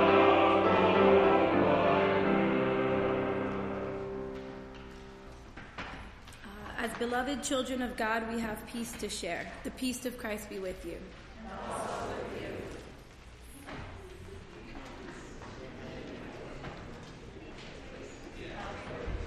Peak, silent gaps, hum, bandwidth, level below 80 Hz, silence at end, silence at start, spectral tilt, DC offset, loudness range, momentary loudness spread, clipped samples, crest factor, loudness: -12 dBFS; none; none; 15 kHz; -52 dBFS; 0 s; 0 s; -5 dB/octave; under 0.1%; 18 LU; 23 LU; under 0.1%; 20 dB; -31 LUFS